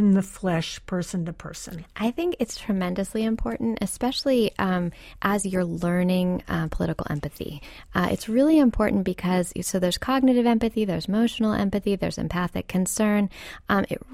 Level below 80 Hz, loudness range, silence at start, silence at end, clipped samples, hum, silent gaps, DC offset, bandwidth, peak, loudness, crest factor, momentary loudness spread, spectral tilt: -42 dBFS; 5 LU; 0 s; 0 s; under 0.1%; none; none; under 0.1%; 15.5 kHz; -6 dBFS; -25 LUFS; 18 dB; 10 LU; -5.5 dB/octave